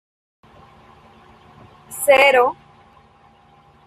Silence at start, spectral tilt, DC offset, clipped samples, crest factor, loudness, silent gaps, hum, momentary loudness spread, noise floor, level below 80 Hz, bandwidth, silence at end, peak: 1.9 s; -1.5 dB/octave; under 0.1%; under 0.1%; 20 dB; -15 LUFS; none; none; 24 LU; -52 dBFS; -60 dBFS; 15 kHz; 1.35 s; -2 dBFS